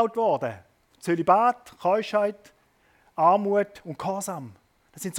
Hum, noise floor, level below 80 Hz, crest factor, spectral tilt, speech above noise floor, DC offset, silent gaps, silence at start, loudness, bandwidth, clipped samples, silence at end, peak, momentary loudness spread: none; -63 dBFS; -70 dBFS; 20 dB; -5.5 dB/octave; 39 dB; under 0.1%; none; 0 s; -25 LUFS; 17.5 kHz; under 0.1%; 0 s; -6 dBFS; 17 LU